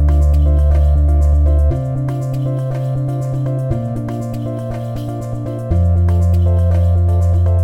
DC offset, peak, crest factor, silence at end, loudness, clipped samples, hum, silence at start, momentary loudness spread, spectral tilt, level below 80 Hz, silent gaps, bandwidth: under 0.1%; -4 dBFS; 10 dB; 0 s; -16 LUFS; under 0.1%; none; 0 s; 10 LU; -9.5 dB/octave; -18 dBFS; none; 7.6 kHz